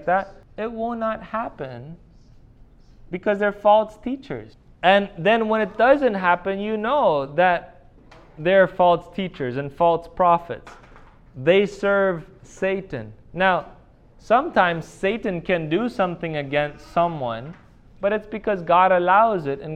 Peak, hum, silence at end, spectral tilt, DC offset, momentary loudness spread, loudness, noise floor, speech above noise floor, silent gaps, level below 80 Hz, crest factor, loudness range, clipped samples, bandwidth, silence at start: -2 dBFS; none; 0 s; -6.5 dB/octave; under 0.1%; 14 LU; -21 LUFS; -49 dBFS; 28 dB; none; -50 dBFS; 20 dB; 5 LU; under 0.1%; 9 kHz; 0 s